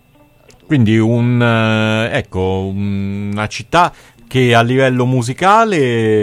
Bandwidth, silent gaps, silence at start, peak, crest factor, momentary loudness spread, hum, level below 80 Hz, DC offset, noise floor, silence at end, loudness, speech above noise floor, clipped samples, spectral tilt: 12.5 kHz; none; 0.7 s; 0 dBFS; 14 dB; 9 LU; none; -46 dBFS; under 0.1%; -48 dBFS; 0 s; -14 LUFS; 34 dB; under 0.1%; -6.5 dB/octave